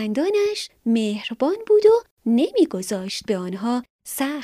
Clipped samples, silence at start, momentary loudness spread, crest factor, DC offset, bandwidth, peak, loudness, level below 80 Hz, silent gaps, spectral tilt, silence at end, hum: under 0.1%; 0 s; 10 LU; 16 dB; under 0.1%; 15.5 kHz; -6 dBFS; -21 LUFS; -64 dBFS; 2.11-2.17 s, 3.90-3.99 s; -5 dB/octave; 0 s; none